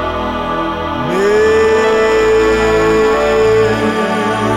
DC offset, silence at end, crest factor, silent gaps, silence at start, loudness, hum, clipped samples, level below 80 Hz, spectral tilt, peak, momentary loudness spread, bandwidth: under 0.1%; 0 s; 8 dB; none; 0 s; -12 LUFS; none; under 0.1%; -32 dBFS; -5 dB/octave; -4 dBFS; 7 LU; 12.5 kHz